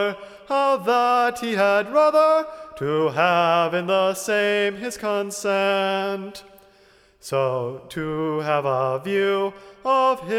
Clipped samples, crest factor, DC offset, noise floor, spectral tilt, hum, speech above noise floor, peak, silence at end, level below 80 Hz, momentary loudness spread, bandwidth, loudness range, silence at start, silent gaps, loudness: under 0.1%; 16 dB; under 0.1%; -55 dBFS; -4.5 dB/octave; none; 34 dB; -6 dBFS; 0 s; -62 dBFS; 12 LU; 16 kHz; 6 LU; 0 s; none; -21 LUFS